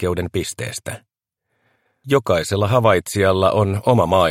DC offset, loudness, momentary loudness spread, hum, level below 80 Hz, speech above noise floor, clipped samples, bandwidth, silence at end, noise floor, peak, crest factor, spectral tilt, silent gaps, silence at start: under 0.1%; -18 LUFS; 12 LU; none; -46 dBFS; 57 dB; under 0.1%; 16.5 kHz; 0 s; -74 dBFS; -2 dBFS; 18 dB; -5.5 dB/octave; none; 0 s